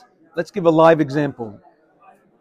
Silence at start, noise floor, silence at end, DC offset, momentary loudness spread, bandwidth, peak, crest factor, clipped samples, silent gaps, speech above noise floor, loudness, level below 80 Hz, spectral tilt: 0.35 s; -52 dBFS; 0.85 s; under 0.1%; 19 LU; 9.6 kHz; -2 dBFS; 18 dB; under 0.1%; none; 35 dB; -17 LUFS; -62 dBFS; -7.5 dB/octave